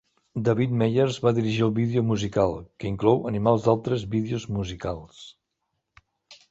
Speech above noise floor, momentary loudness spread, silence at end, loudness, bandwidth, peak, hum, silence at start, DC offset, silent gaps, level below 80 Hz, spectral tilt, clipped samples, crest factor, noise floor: 55 dB; 11 LU; 0.15 s; -24 LUFS; 8 kHz; -6 dBFS; none; 0.35 s; under 0.1%; none; -50 dBFS; -7.5 dB/octave; under 0.1%; 20 dB; -79 dBFS